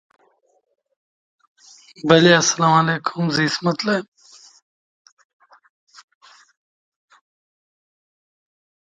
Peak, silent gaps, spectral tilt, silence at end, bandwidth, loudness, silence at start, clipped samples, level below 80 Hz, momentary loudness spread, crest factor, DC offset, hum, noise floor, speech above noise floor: 0 dBFS; none; -4 dB/octave; 4.95 s; 9.2 kHz; -17 LUFS; 2.05 s; under 0.1%; -64 dBFS; 10 LU; 22 dB; under 0.1%; none; -49 dBFS; 32 dB